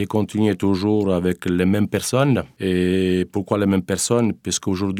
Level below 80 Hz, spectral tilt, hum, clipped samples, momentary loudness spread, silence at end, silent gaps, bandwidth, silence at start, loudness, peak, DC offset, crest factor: -52 dBFS; -5.5 dB/octave; none; under 0.1%; 4 LU; 0 s; none; 16 kHz; 0 s; -20 LUFS; -4 dBFS; under 0.1%; 16 dB